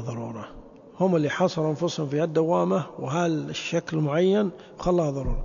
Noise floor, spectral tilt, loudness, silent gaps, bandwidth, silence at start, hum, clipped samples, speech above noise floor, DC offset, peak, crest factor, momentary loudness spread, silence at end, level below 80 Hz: -46 dBFS; -6.5 dB/octave; -25 LUFS; none; 7.4 kHz; 0 s; none; under 0.1%; 21 dB; under 0.1%; -10 dBFS; 16 dB; 9 LU; 0 s; -40 dBFS